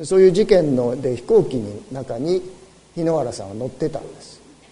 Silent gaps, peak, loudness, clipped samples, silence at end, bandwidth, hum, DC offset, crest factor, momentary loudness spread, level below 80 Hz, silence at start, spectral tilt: none; -2 dBFS; -20 LUFS; under 0.1%; 0.35 s; 11 kHz; none; under 0.1%; 18 dB; 18 LU; -48 dBFS; 0 s; -6.5 dB/octave